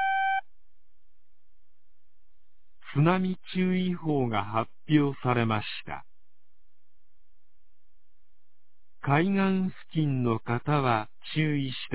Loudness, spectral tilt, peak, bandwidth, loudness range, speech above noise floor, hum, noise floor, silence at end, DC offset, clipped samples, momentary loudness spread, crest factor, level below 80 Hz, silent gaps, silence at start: -28 LUFS; -5.5 dB/octave; -8 dBFS; 4 kHz; 7 LU; 48 dB; none; -75 dBFS; 0 s; 1%; under 0.1%; 8 LU; 20 dB; -62 dBFS; none; 0 s